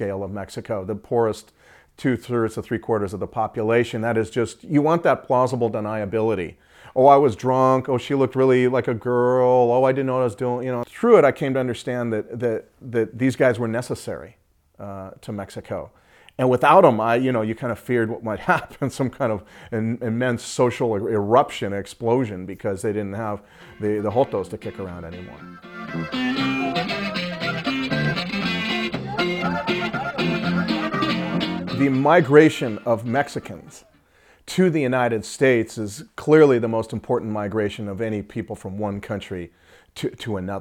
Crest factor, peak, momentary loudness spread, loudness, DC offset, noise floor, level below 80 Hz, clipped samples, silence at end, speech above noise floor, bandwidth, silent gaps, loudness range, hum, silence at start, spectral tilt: 22 dB; 0 dBFS; 15 LU; -21 LUFS; under 0.1%; -56 dBFS; -56 dBFS; under 0.1%; 0 s; 35 dB; 16 kHz; none; 7 LU; none; 0 s; -6.5 dB/octave